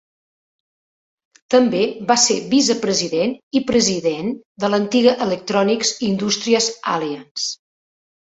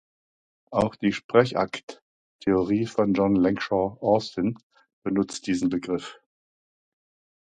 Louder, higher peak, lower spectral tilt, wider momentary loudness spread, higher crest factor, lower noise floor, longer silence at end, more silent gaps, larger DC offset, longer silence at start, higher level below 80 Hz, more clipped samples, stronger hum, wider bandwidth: first, -18 LUFS vs -25 LUFS; first, -2 dBFS vs -6 dBFS; second, -3 dB/octave vs -6.5 dB/octave; about the same, 9 LU vs 10 LU; about the same, 18 dB vs 20 dB; about the same, under -90 dBFS vs under -90 dBFS; second, 0.7 s vs 1.3 s; second, 3.43-3.51 s, 4.45-4.55 s, 7.31-7.35 s vs 1.24-1.29 s, 1.83-1.88 s, 2.02-2.39 s, 4.63-4.70 s, 4.93-5.02 s; neither; first, 1.5 s vs 0.7 s; about the same, -58 dBFS vs -56 dBFS; neither; neither; second, 8.2 kHz vs 10 kHz